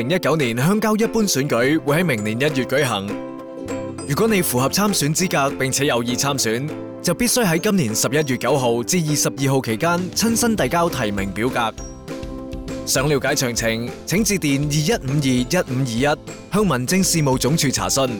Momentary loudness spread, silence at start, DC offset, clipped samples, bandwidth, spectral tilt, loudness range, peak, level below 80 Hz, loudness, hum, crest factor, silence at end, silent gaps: 9 LU; 0 s; under 0.1%; under 0.1%; over 20 kHz; -4 dB/octave; 2 LU; -8 dBFS; -42 dBFS; -19 LUFS; none; 10 dB; 0 s; none